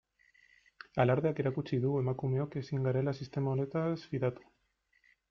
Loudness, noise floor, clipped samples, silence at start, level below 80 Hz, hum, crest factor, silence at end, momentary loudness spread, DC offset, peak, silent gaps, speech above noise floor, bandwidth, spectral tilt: -33 LUFS; -75 dBFS; under 0.1%; 0.95 s; -66 dBFS; none; 20 dB; 0.95 s; 7 LU; under 0.1%; -14 dBFS; none; 43 dB; 6.4 kHz; -9 dB/octave